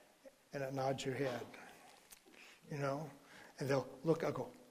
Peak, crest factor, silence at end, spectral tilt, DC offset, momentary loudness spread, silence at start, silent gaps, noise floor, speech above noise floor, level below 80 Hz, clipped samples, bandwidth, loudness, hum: -22 dBFS; 22 dB; 0 s; -6 dB/octave; under 0.1%; 21 LU; 0.25 s; none; -64 dBFS; 24 dB; -76 dBFS; under 0.1%; 15.5 kHz; -41 LUFS; none